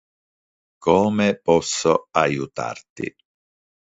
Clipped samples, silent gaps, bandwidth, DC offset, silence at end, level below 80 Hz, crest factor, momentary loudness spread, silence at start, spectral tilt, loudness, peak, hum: under 0.1%; 2.90-2.96 s; 8 kHz; under 0.1%; 0.8 s; -54 dBFS; 20 dB; 14 LU; 0.8 s; -4.5 dB/octave; -20 LUFS; -2 dBFS; none